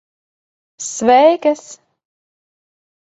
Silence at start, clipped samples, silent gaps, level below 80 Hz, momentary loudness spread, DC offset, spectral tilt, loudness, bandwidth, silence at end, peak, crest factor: 0.8 s; under 0.1%; none; -62 dBFS; 15 LU; under 0.1%; -3 dB/octave; -13 LUFS; 8.2 kHz; 1.3 s; 0 dBFS; 18 dB